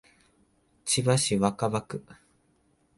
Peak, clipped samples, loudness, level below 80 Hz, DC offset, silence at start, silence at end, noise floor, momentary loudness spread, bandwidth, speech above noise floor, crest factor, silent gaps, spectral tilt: -10 dBFS; under 0.1%; -26 LUFS; -60 dBFS; under 0.1%; 0.85 s; 0.85 s; -68 dBFS; 16 LU; 11.5 kHz; 41 dB; 20 dB; none; -4.5 dB/octave